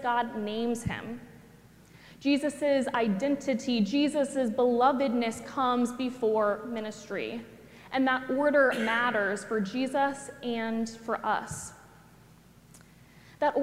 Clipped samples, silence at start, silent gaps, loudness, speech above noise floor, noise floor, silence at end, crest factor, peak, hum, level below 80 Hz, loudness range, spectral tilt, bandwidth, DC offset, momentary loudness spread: under 0.1%; 0 s; none; -29 LUFS; 28 dB; -56 dBFS; 0 s; 18 dB; -10 dBFS; none; -62 dBFS; 5 LU; -5 dB/octave; 15.5 kHz; under 0.1%; 12 LU